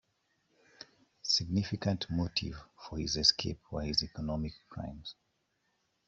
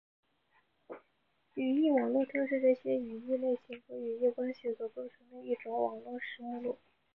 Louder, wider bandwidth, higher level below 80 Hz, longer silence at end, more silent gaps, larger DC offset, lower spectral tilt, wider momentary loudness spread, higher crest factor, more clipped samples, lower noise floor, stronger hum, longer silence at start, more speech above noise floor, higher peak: about the same, -33 LUFS vs -34 LUFS; first, 8 kHz vs 5.8 kHz; first, -54 dBFS vs -82 dBFS; first, 0.95 s vs 0.4 s; neither; neither; second, -4 dB/octave vs -8 dB/octave; first, 22 LU vs 17 LU; first, 26 dB vs 18 dB; neither; about the same, -78 dBFS vs -77 dBFS; neither; about the same, 0.8 s vs 0.9 s; about the same, 44 dB vs 43 dB; first, -10 dBFS vs -18 dBFS